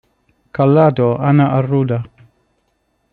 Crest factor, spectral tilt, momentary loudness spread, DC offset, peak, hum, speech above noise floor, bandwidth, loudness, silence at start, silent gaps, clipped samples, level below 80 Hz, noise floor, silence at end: 14 dB; -11.5 dB/octave; 13 LU; under 0.1%; -2 dBFS; none; 52 dB; 4.4 kHz; -14 LUFS; 0.6 s; none; under 0.1%; -54 dBFS; -65 dBFS; 1.05 s